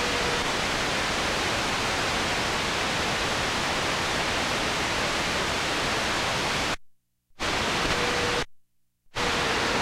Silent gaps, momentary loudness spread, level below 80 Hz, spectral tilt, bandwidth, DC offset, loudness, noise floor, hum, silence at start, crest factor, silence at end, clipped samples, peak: none; 3 LU; -44 dBFS; -2.5 dB/octave; 16 kHz; under 0.1%; -25 LUFS; -62 dBFS; none; 0 s; 14 dB; 0 s; under 0.1%; -12 dBFS